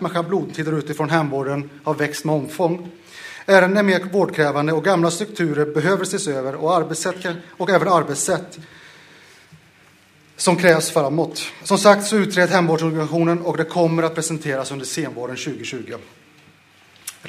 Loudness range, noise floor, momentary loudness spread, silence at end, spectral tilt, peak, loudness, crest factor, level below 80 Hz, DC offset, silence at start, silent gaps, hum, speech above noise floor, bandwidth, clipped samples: 6 LU; -52 dBFS; 13 LU; 0 s; -4.5 dB/octave; 0 dBFS; -19 LUFS; 20 dB; -66 dBFS; under 0.1%; 0 s; none; none; 33 dB; 15.5 kHz; under 0.1%